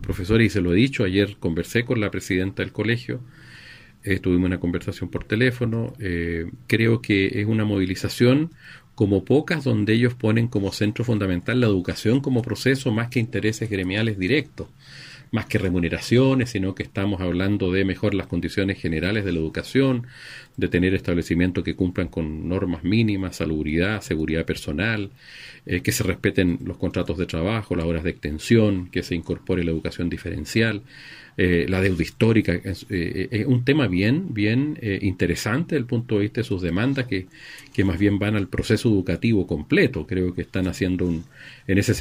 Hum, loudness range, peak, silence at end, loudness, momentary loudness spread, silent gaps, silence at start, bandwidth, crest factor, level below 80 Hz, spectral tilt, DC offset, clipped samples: none; 3 LU; -4 dBFS; 0 s; -23 LUFS; 9 LU; none; 0 s; 16 kHz; 18 dB; -44 dBFS; -6.5 dB/octave; under 0.1%; under 0.1%